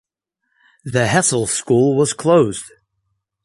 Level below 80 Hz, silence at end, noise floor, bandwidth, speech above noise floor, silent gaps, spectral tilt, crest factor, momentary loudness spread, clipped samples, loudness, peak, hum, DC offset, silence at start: -52 dBFS; 0.75 s; -74 dBFS; 11.5 kHz; 58 dB; none; -4.5 dB/octave; 16 dB; 8 LU; under 0.1%; -16 LUFS; -2 dBFS; none; under 0.1%; 0.85 s